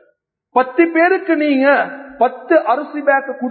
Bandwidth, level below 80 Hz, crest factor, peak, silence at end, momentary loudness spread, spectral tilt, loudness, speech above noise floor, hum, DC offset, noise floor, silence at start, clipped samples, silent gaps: 4.5 kHz; -68 dBFS; 16 dB; 0 dBFS; 0 s; 6 LU; -9.5 dB/octave; -15 LUFS; 47 dB; none; under 0.1%; -61 dBFS; 0.55 s; under 0.1%; none